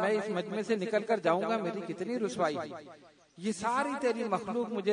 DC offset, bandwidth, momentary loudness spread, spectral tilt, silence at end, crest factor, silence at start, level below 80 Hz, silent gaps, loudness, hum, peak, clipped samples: under 0.1%; 10.5 kHz; 8 LU; -5.5 dB/octave; 0 s; 18 dB; 0 s; -76 dBFS; none; -32 LUFS; none; -14 dBFS; under 0.1%